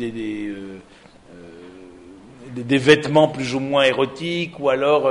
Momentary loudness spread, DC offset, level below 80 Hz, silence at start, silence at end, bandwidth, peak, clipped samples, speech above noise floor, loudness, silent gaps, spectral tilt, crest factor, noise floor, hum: 20 LU; under 0.1%; -56 dBFS; 0 s; 0 s; 11 kHz; 0 dBFS; under 0.1%; 23 dB; -19 LUFS; none; -5.5 dB/octave; 20 dB; -43 dBFS; none